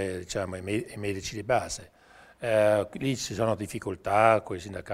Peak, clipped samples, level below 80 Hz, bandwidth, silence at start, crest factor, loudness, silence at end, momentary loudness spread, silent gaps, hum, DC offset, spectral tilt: -6 dBFS; under 0.1%; -56 dBFS; 15.5 kHz; 0 s; 22 dB; -28 LUFS; 0 s; 13 LU; none; none; under 0.1%; -5 dB/octave